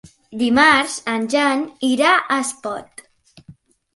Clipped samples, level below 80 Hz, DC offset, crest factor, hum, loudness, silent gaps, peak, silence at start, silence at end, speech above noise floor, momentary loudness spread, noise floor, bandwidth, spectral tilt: under 0.1%; -58 dBFS; under 0.1%; 18 dB; none; -17 LUFS; none; -2 dBFS; 0.05 s; 0.45 s; 30 dB; 16 LU; -47 dBFS; 11.5 kHz; -2.5 dB/octave